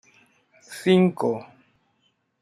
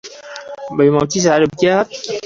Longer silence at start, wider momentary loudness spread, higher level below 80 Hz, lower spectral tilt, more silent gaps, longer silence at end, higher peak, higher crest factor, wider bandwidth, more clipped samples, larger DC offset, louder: first, 0.7 s vs 0.05 s; second, 15 LU vs 18 LU; second, -70 dBFS vs -52 dBFS; first, -7 dB/octave vs -5 dB/octave; neither; first, 1 s vs 0 s; second, -6 dBFS vs 0 dBFS; about the same, 20 dB vs 16 dB; first, 13 kHz vs 7.8 kHz; neither; neither; second, -22 LUFS vs -15 LUFS